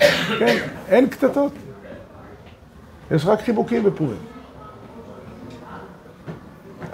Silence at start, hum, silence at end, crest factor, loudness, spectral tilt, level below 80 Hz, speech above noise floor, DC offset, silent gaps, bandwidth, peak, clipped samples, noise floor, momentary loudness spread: 0 s; none; 0 s; 20 dB; -20 LUFS; -5.5 dB/octave; -52 dBFS; 25 dB; under 0.1%; none; 16 kHz; -2 dBFS; under 0.1%; -44 dBFS; 23 LU